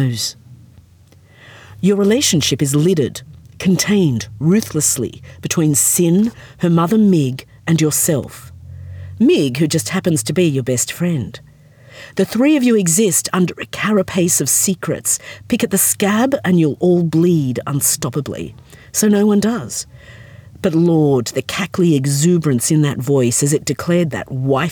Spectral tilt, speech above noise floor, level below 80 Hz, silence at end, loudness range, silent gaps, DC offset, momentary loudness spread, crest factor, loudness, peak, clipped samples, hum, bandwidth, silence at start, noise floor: -4.5 dB/octave; 31 dB; -52 dBFS; 0 s; 3 LU; none; under 0.1%; 10 LU; 16 dB; -15 LUFS; 0 dBFS; under 0.1%; none; over 20 kHz; 0 s; -47 dBFS